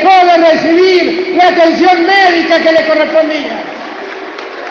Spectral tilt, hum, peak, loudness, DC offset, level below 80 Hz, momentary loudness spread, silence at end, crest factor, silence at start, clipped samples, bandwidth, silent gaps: -4 dB/octave; none; 0 dBFS; -8 LUFS; under 0.1%; -56 dBFS; 16 LU; 0 s; 8 dB; 0 s; 0.1%; 7.2 kHz; none